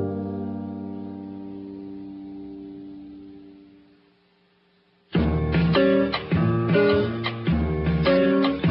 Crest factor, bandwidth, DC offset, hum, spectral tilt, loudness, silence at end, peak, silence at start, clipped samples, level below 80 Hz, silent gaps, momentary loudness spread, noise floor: 16 dB; 5.6 kHz; under 0.1%; none; -11.5 dB/octave; -23 LUFS; 0 s; -8 dBFS; 0 s; under 0.1%; -38 dBFS; none; 20 LU; -62 dBFS